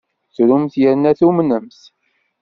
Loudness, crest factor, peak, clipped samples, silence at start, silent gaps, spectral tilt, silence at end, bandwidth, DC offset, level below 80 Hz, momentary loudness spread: -15 LUFS; 14 dB; -2 dBFS; under 0.1%; 0.4 s; none; -8 dB/octave; 0.75 s; 6.2 kHz; under 0.1%; -56 dBFS; 8 LU